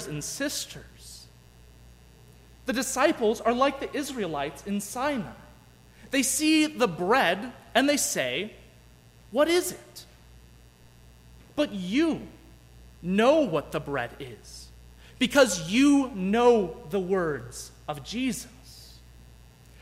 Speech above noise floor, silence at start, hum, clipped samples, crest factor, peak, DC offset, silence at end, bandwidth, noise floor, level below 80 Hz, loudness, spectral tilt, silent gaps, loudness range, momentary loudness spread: 28 dB; 0 s; 60 Hz at -55 dBFS; under 0.1%; 20 dB; -8 dBFS; under 0.1%; 0.85 s; 16 kHz; -54 dBFS; -54 dBFS; -26 LUFS; -3.5 dB/octave; none; 7 LU; 22 LU